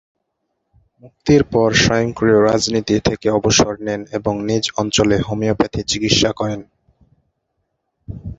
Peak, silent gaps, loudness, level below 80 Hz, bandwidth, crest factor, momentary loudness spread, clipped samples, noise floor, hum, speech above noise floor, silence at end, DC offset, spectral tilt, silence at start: 0 dBFS; none; -16 LUFS; -40 dBFS; 8.2 kHz; 18 dB; 10 LU; under 0.1%; -73 dBFS; none; 56 dB; 0.05 s; under 0.1%; -4.5 dB/octave; 1.05 s